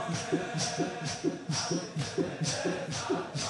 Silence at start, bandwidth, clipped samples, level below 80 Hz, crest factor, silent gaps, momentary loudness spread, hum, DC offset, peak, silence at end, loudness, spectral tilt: 0 s; 11.5 kHz; under 0.1%; -64 dBFS; 16 dB; none; 2 LU; none; under 0.1%; -16 dBFS; 0 s; -33 LUFS; -4 dB/octave